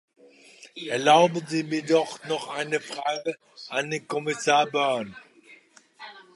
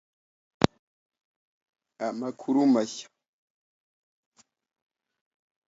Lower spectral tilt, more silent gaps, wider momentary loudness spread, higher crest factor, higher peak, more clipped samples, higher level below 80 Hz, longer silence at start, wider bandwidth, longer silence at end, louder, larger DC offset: second, -4 dB/octave vs -6 dB/octave; second, none vs 0.79-1.10 s, 1.24-1.61 s, 1.69-1.73 s; first, 20 LU vs 12 LU; second, 20 dB vs 32 dB; second, -6 dBFS vs 0 dBFS; neither; second, -76 dBFS vs -60 dBFS; about the same, 0.6 s vs 0.6 s; first, 11.5 kHz vs 8 kHz; second, 0.15 s vs 2.65 s; about the same, -25 LUFS vs -27 LUFS; neither